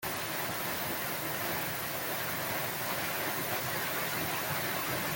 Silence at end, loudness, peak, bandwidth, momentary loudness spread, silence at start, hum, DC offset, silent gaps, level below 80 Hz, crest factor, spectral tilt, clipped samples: 0 s; -33 LUFS; -20 dBFS; 17 kHz; 2 LU; 0 s; none; under 0.1%; none; -64 dBFS; 14 dB; -2.5 dB/octave; under 0.1%